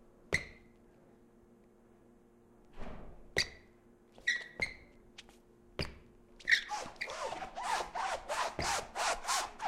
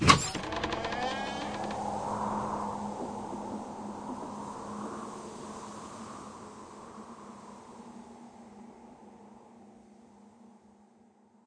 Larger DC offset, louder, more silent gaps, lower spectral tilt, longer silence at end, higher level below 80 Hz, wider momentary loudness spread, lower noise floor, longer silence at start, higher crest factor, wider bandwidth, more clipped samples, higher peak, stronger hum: neither; about the same, -36 LUFS vs -35 LUFS; neither; second, -1.5 dB/octave vs -4 dB/octave; second, 0 s vs 0.65 s; about the same, -56 dBFS vs -56 dBFS; about the same, 22 LU vs 21 LU; about the same, -63 dBFS vs -62 dBFS; first, 0.2 s vs 0 s; second, 26 dB vs 32 dB; first, 16 kHz vs 11 kHz; neither; second, -14 dBFS vs -4 dBFS; neither